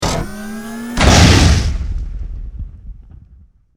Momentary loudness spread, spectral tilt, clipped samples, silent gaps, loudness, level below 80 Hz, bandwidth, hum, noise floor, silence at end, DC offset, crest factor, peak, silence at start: 22 LU; -4.5 dB/octave; under 0.1%; none; -12 LUFS; -20 dBFS; 16 kHz; none; -46 dBFS; 0.8 s; under 0.1%; 16 dB; 0 dBFS; 0 s